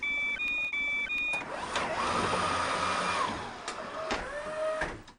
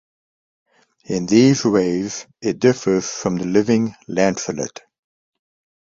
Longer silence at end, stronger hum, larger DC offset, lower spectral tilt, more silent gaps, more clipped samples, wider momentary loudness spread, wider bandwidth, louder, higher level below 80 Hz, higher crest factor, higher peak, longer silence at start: second, 0.05 s vs 1.15 s; neither; neither; second, -3 dB/octave vs -5.5 dB/octave; neither; neither; second, 8 LU vs 12 LU; first, 11.5 kHz vs 7.8 kHz; second, -31 LUFS vs -19 LUFS; about the same, -54 dBFS vs -56 dBFS; about the same, 16 dB vs 18 dB; second, -16 dBFS vs -2 dBFS; second, 0 s vs 1.1 s